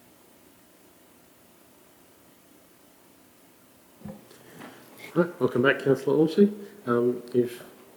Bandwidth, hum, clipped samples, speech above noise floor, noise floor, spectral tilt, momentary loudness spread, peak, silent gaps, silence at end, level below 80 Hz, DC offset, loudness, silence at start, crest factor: over 20 kHz; none; under 0.1%; 32 dB; -56 dBFS; -7 dB/octave; 23 LU; -6 dBFS; none; 0.3 s; -74 dBFS; under 0.1%; -25 LUFS; 4.05 s; 22 dB